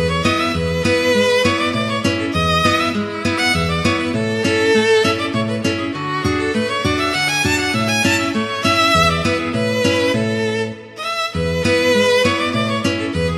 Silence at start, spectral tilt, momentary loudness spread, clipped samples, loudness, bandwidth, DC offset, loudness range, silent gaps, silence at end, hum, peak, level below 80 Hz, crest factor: 0 s; -4.5 dB/octave; 6 LU; under 0.1%; -17 LUFS; 16 kHz; under 0.1%; 2 LU; none; 0 s; none; -2 dBFS; -38 dBFS; 16 dB